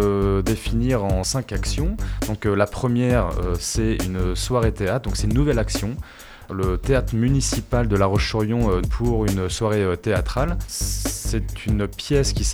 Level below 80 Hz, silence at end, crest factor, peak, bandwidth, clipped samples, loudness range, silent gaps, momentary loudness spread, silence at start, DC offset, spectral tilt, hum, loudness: -28 dBFS; 0 s; 16 dB; -4 dBFS; 19.5 kHz; under 0.1%; 2 LU; none; 6 LU; 0 s; under 0.1%; -5.5 dB/octave; none; -22 LUFS